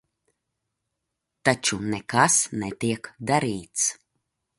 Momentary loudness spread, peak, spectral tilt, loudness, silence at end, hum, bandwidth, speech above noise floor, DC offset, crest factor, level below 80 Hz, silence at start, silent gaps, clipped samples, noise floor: 10 LU; -4 dBFS; -3 dB/octave; -24 LUFS; 0.65 s; none; 12 kHz; 57 dB; under 0.1%; 24 dB; -60 dBFS; 1.45 s; none; under 0.1%; -82 dBFS